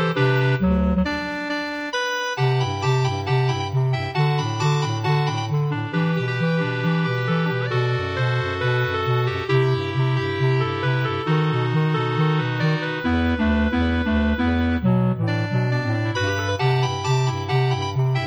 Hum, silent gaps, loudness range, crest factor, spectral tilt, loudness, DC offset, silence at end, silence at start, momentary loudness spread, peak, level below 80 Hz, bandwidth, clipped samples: none; none; 1 LU; 14 dB; -6.5 dB/octave; -22 LUFS; under 0.1%; 0 s; 0 s; 3 LU; -6 dBFS; -36 dBFS; 7.8 kHz; under 0.1%